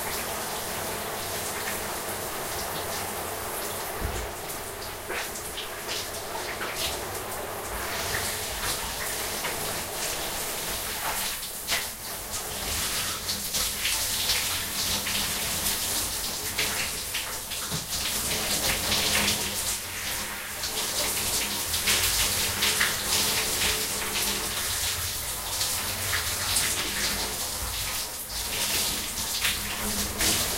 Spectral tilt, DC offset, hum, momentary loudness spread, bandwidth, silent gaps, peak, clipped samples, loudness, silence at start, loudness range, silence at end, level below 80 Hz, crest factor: -1 dB/octave; under 0.1%; none; 8 LU; 16 kHz; none; -8 dBFS; under 0.1%; -27 LUFS; 0 s; 8 LU; 0 s; -46 dBFS; 22 dB